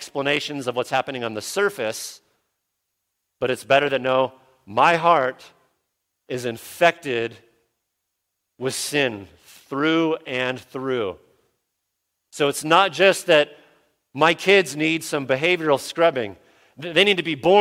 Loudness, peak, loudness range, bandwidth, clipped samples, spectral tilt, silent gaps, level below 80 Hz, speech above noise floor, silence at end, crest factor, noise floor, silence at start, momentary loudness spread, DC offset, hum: -21 LUFS; -2 dBFS; 7 LU; 16.5 kHz; under 0.1%; -3.5 dB/octave; none; -66 dBFS; 58 dB; 0 s; 22 dB; -78 dBFS; 0 s; 13 LU; under 0.1%; none